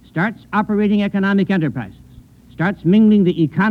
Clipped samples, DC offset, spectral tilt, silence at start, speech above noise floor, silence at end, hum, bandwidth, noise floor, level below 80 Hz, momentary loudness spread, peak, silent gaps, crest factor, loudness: under 0.1%; under 0.1%; -9 dB/octave; 0.15 s; 28 dB; 0 s; none; 4.7 kHz; -43 dBFS; -48 dBFS; 10 LU; -4 dBFS; none; 12 dB; -16 LUFS